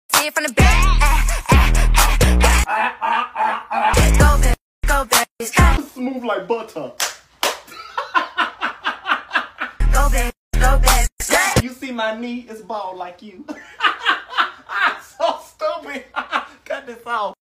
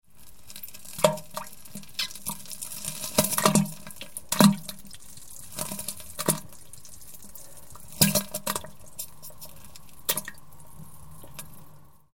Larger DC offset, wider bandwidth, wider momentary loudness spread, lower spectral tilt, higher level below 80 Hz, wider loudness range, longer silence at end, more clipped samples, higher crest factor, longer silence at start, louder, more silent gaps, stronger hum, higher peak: second, under 0.1% vs 0.8%; about the same, 16 kHz vs 17 kHz; second, 14 LU vs 24 LU; about the same, -3.5 dB/octave vs -3.5 dB/octave; first, -20 dBFS vs -56 dBFS; about the same, 7 LU vs 9 LU; first, 0.15 s vs 0 s; neither; second, 18 dB vs 28 dB; about the same, 0.1 s vs 0 s; first, -18 LUFS vs -27 LUFS; first, 4.61-4.82 s, 5.31-5.36 s, 10.37-10.51 s, 11.12-11.17 s vs none; neither; about the same, 0 dBFS vs -2 dBFS